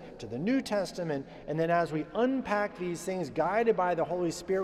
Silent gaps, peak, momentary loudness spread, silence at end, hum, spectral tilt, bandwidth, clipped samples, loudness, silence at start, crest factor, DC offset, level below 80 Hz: none; -16 dBFS; 8 LU; 0 s; none; -6 dB/octave; 14 kHz; under 0.1%; -31 LUFS; 0 s; 14 dB; under 0.1%; -60 dBFS